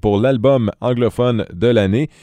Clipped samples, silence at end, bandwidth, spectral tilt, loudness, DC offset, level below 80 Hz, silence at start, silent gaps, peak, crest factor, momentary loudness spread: under 0.1%; 0.15 s; 11 kHz; -8 dB/octave; -16 LUFS; under 0.1%; -40 dBFS; 0.05 s; none; -2 dBFS; 14 dB; 4 LU